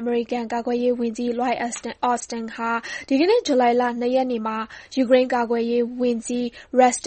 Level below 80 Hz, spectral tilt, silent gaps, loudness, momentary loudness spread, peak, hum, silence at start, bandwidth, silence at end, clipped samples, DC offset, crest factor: -60 dBFS; -3.5 dB/octave; none; -22 LUFS; 9 LU; -4 dBFS; none; 0 s; 8.8 kHz; 0.05 s; under 0.1%; under 0.1%; 18 dB